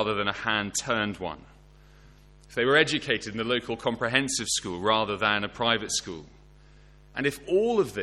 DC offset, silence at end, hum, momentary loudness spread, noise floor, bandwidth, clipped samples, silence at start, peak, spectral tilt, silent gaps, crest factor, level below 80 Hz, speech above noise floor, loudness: under 0.1%; 0 s; 50 Hz at -55 dBFS; 12 LU; -53 dBFS; 15 kHz; under 0.1%; 0 s; -4 dBFS; -3 dB/octave; none; 24 dB; -54 dBFS; 26 dB; -26 LUFS